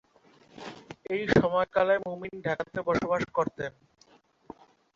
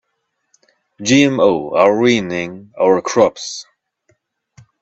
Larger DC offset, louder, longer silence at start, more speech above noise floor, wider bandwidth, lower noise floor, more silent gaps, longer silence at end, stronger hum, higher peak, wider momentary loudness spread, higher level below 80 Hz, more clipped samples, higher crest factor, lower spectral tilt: neither; second, -28 LUFS vs -15 LUFS; second, 0.55 s vs 1 s; second, 34 dB vs 56 dB; about the same, 7.6 kHz vs 8.2 kHz; second, -62 dBFS vs -71 dBFS; neither; about the same, 1.25 s vs 1.2 s; neither; second, -8 dBFS vs 0 dBFS; first, 20 LU vs 15 LU; about the same, -58 dBFS vs -56 dBFS; neither; first, 22 dB vs 16 dB; first, -6.5 dB/octave vs -4.5 dB/octave